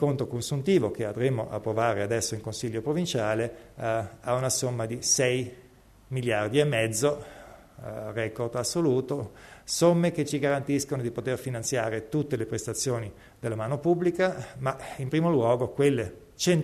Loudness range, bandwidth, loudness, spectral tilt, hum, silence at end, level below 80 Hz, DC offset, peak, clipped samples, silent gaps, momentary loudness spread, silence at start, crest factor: 2 LU; 13.5 kHz; -28 LUFS; -5 dB/octave; none; 0 s; -58 dBFS; under 0.1%; -10 dBFS; under 0.1%; none; 10 LU; 0 s; 18 dB